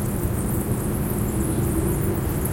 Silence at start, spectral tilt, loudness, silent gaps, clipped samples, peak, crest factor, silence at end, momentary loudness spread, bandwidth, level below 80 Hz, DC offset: 0 s; -6.5 dB/octave; -24 LUFS; none; under 0.1%; -12 dBFS; 12 dB; 0 s; 2 LU; 17 kHz; -32 dBFS; under 0.1%